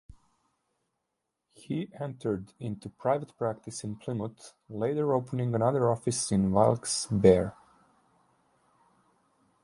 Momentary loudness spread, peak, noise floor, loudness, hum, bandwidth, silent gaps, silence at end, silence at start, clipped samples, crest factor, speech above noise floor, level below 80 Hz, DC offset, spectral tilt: 15 LU; -8 dBFS; -84 dBFS; -29 LUFS; none; 11.5 kHz; none; 2.15 s; 1.7 s; under 0.1%; 24 dB; 55 dB; -56 dBFS; under 0.1%; -6 dB/octave